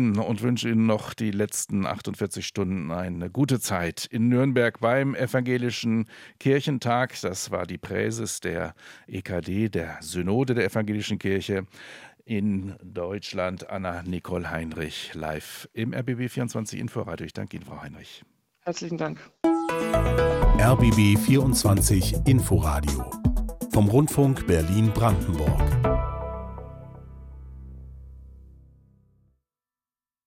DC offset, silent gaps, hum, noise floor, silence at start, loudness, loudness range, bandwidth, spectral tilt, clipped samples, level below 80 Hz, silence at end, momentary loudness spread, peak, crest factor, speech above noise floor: under 0.1%; none; none; under -90 dBFS; 0 s; -25 LUFS; 11 LU; 16.5 kHz; -6 dB/octave; under 0.1%; -36 dBFS; 1.9 s; 17 LU; -8 dBFS; 18 dB; over 66 dB